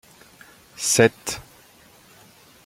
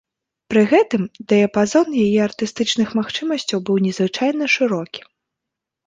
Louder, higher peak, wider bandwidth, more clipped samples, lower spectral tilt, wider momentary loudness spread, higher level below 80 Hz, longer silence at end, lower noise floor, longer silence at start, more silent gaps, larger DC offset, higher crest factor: second, -21 LUFS vs -18 LUFS; about the same, -2 dBFS vs -2 dBFS; first, 16.5 kHz vs 9.4 kHz; neither; second, -3 dB/octave vs -5 dB/octave; first, 18 LU vs 7 LU; about the same, -58 dBFS vs -60 dBFS; first, 1.25 s vs 0.85 s; second, -52 dBFS vs -83 dBFS; first, 0.8 s vs 0.5 s; neither; neither; first, 24 dB vs 16 dB